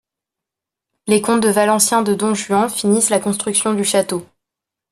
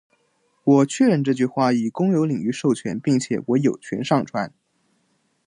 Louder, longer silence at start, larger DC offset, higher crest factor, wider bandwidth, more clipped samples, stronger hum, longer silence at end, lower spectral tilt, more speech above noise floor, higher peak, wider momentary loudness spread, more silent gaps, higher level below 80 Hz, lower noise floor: first, -16 LUFS vs -21 LUFS; first, 1.05 s vs 0.65 s; neither; about the same, 18 dB vs 16 dB; first, 14 kHz vs 10.5 kHz; neither; neither; second, 0.65 s vs 1 s; second, -3.5 dB/octave vs -6.5 dB/octave; first, 69 dB vs 47 dB; first, 0 dBFS vs -4 dBFS; second, 5 LU vs 8 LU; neither; first, -60 dBFS vs -66 dBFS; first, -85 dBFS vs -67 dBFS